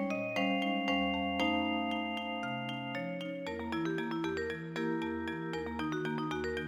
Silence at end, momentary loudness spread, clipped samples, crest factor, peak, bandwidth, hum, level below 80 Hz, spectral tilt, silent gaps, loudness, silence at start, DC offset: 0 s; 7 LU; under 0.1%; 16 dB; -20 dBFS; 17.5 kHz; none; -60 dBFS; -6 dB/octave; none; -35 LUFS; 0 s; under 0.1%